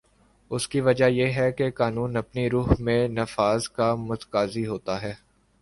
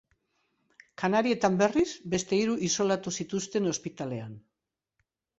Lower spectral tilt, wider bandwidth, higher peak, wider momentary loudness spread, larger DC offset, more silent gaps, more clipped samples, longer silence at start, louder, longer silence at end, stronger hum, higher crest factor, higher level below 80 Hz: first, -6 dB/octave vs -4.5 dB/octave; first, 11.5 kHz vs 8.2 kHz; first, -6 dBFS vs -10 dBFS; about the same, 10 LU vs 11 LU; neither; neither; neither; second, 0.5 s vs 1 s; first, -25 LUFS vs -28 LUFS; second, 0.45 s vs 1 s; neither; about the same, 18 dB vs 20 dB; first, -42 dBFS vs -64 dBFS